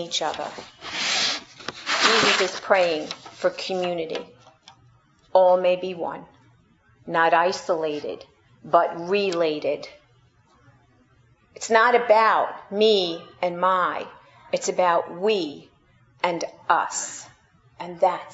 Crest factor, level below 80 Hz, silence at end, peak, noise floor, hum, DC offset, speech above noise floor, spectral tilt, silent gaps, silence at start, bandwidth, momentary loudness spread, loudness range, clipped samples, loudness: 22 dB; -68 dBFS; 0 s; -2 dBFS; -59 dBFS; none; under 0.1%; 37 dB; -2.5 dB/octave; none; 0 s; 8 kHz; 16 LU; 5 LU; under 0.1%; -22 LUFS